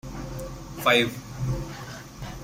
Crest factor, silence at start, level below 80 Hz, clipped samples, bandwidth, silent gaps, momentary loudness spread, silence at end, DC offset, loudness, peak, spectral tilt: 22 dB; 0.05 s; -42 dBFS; under 0.1%; 16 kHz; none; 18 LU; 0 s; under 0.1%; -26 LUFS; -6 dBFS; -4.5 dB/octave